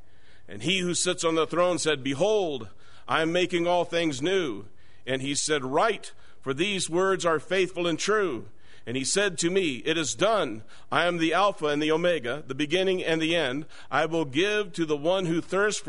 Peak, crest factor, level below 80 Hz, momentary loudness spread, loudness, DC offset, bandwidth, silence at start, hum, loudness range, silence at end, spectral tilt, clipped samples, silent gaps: -8 dBFS; 18 dB; -60 dBFS; 9 LU; -26 LUFS; 1%; 11 kHz; 0.5 s; none; 2 LU; 0.05 s; -3.5 dB/octave; under 0.1%; none